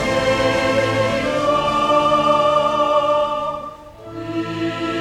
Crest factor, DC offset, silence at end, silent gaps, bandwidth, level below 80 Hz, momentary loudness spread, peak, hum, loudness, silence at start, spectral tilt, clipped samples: 14 dB; under 0.1%; 0 s; none; 13.5 kHz; -44 dBFS; 13 LU; -4 dBFS; none; -18 LUFS; 0 s; -5 dB/octave; under 0.1%